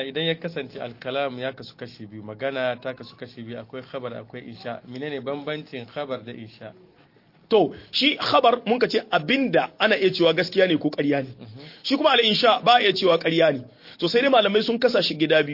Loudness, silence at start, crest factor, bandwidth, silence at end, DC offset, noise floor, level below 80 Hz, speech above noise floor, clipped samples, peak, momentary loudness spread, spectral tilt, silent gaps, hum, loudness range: -21 LUFS; 0 s; 18 dB; 5.8 kHz; 0 s; under 0.1%; -56 dBFS; -68 dBFS; 33 dB; under 0.1%; -4 dBFS; 20 LU; -5.5 dB/octave; none; none; 14 LU